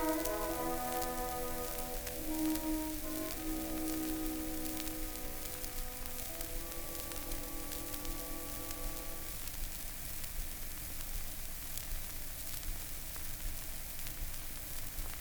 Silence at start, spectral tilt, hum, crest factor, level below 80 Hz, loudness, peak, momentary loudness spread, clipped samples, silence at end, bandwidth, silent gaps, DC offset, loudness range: 0 s; -3.5 dB/octave; none; 24 dB; -44 dBFS; -40 LUFS; -16 dBFS; 5 LU; under 0.1%; 0 s; over 20 kHz; none; under 0.1%; 4 LU